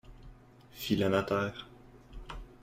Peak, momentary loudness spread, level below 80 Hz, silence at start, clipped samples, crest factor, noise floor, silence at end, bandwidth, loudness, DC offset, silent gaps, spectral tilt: -14 dBFS; 24 LU; -52 dBFS; 0.05 s; under 0.1%; 22 dB; -55 dBFS; 0.05 s; 15.5 kHz; -32 LUFS; under 0.1%; none; -6 dB/octave